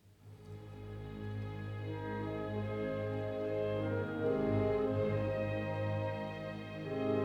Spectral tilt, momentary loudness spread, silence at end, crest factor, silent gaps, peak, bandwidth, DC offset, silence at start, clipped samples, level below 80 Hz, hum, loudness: -9 dB/octave; 13 LU; 0 s; 16 dB; none; -20 dBFS; 6.8 kHz; under 0.1%; 0.05 s; under 0.1%; -58 dBFS; none; -37 LUFS